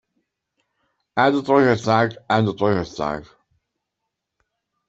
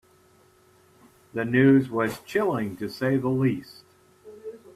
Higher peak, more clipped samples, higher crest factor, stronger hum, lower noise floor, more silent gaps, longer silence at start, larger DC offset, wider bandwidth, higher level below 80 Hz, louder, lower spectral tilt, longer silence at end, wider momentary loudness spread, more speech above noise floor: first, -2 dBFS vs -8 dBFS; neither; about the same, 20 dB vs 18 dB; neither; first, -81 dBFS vs -59 dBFS; neither; second, 1.15 s vs 1.35 s; neither; second, 8 kHz vs 14 kHz; first, -56 dBFS vs -64 dBFS; first, -20 LUFS vs -24 LUFS; about the same, -6.5 dB/octave vs -7.5 dB/octave; first, 1.65 s vs 0.2 s; second, 11 LU vs 18 LU; first, 62 dB vs 35 dB